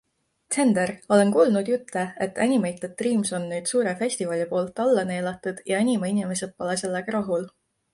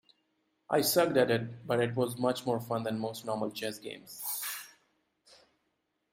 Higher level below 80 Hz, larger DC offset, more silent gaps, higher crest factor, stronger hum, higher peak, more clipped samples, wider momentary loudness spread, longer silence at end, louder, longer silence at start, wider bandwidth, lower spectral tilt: first, -66 dBFS vs -74 dBFS; neither; neither; about the same, 18 dB vs 20 dB; neither; first, -6 dBFS vs -12 dBFS; neither; second, 9 LU vs 13 LU; second, 0.45 s vs 1.45 s; first, -24 LUFS vs -32 LUFS; second, 0.5 s vs 0.7 s; second, 11.5 kHz vs 16 kHz; about the same, -5 dB/octave vs -4.5 dB/octave